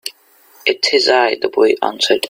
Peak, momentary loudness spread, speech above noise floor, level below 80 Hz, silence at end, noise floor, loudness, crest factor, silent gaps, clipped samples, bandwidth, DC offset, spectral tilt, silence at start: 0 dBFS; 7 LU; 35 dB; -64 dBFS; 0 s; -49 dBFS; -14 LUFS; 16 dB; none; under 0.1%; 16 kHz; under 0.1%; -1.5 dB/octave; 0.05 s